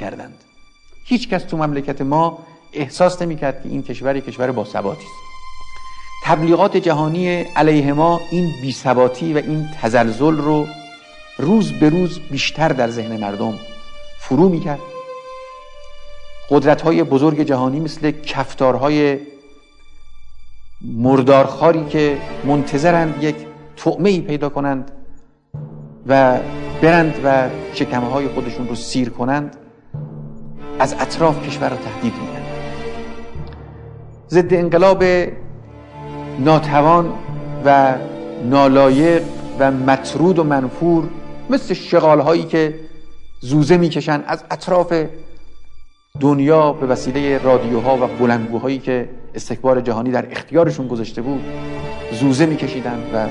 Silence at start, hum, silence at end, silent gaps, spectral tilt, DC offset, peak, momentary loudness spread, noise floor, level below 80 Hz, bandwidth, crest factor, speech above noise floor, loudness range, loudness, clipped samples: 0 s; none; 0 s; none; -6.5 dB/octave; under 0.1%; 0 dBFS; 20 LU; -43 dBFS; -42 dBFS; 10.5 kHz; 16 dB; 27 dB; 7 LU; -16 LUFS; under 0.1%